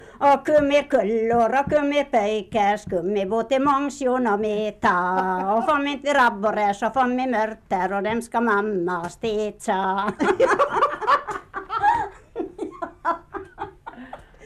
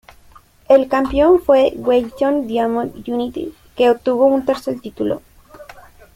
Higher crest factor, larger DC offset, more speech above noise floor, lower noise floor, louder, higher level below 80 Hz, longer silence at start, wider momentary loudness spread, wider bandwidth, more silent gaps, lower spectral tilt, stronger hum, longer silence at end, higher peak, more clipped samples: about the same, 14 dB vs 16 dB; neither; second, 20 dB vs 31 dB; second, -41 dBFS vs -47 dBFS; second, -22 LUFS vs -17 LUFS; second, -52 dBFS vs -44 dBFS; second, 0 s vs 0.7 s; about the same, 13 LU vs 11 LU; second, 13 kHz vs 16 kHz; neither; second, -5 dB/octave vs -6.5 dB/octave; neither; second, 0 s vs 0.35 s; second, -8 dBFS vs -2 dBFS; neither